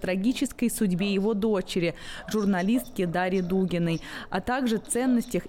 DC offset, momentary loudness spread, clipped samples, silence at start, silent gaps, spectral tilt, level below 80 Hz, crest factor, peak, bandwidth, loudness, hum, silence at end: under 0.1%; 6 LU; under 0.1%; 0 s; none; -5.5 dB/octave; -48 dBFS; 10 dB; -16 dBFS; 17 kHz; -27 LUFS; none; 0 s